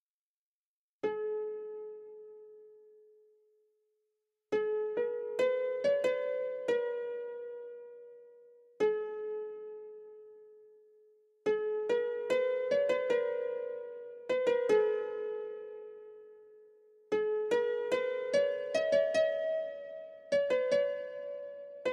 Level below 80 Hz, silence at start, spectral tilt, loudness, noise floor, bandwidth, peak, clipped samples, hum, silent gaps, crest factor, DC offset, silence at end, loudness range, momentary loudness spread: -84 dBFS; 1.05 s; -4 dB/octave; -33 LUFS; under -90 dBFS; 10.5 kHz; -16 dBFS; under 0.1%; none; none; 18 dB; under 0.1%; 0 s; 9 LU; 18 LU